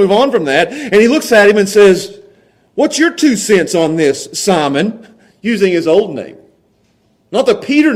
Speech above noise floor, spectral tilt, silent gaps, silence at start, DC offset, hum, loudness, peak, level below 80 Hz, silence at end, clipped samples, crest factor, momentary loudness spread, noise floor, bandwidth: 45 dB; -4.5 dB/octave; none; 0 s; under 0.1%; none; -11 LUFS; 0 dBFS; -52 dBFS; 0 s; under 0.1%; 12 dB; 11 LU; -55 dBFS; 15.5 kHz